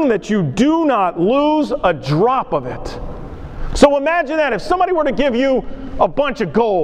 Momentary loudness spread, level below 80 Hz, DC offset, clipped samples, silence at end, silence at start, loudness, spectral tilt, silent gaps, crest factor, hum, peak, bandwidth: 15 LU; -32 dBFS; under 0.1%; under 0.1%; 0 s; 0 s; -16 LUFS; -6 dB/octave; none; 16 dB; none; 0 dBFS; 11 kHz